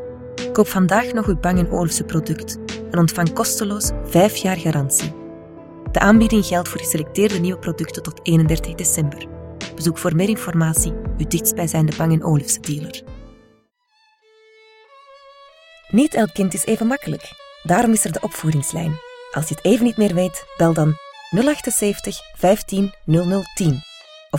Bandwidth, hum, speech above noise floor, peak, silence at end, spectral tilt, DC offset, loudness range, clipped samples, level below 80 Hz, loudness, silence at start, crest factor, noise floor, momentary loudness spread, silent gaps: 17 kHz; none; 43 dB; 0 dBFS; 0 s; -5 dB/octave; under 0.1%; 4 LU; under 0.1%; -36 dBFS; -19 LUFS; 0 s; 20 dB; -61 dBFS; 13 LU; none